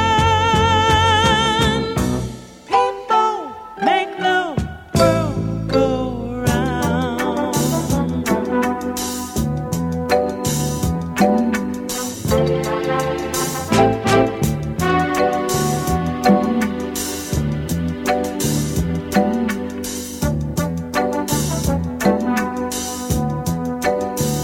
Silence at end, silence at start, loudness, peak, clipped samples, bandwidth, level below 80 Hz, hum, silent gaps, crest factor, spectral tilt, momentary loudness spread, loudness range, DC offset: 0 s; 0 s; -19 LUFS; -2 dBFS; under 0.1%; 19 kHz; -34 dBFS; none; none; 16 dB; -5 dB/octave; 8 LU; 3 LU; under 0.1%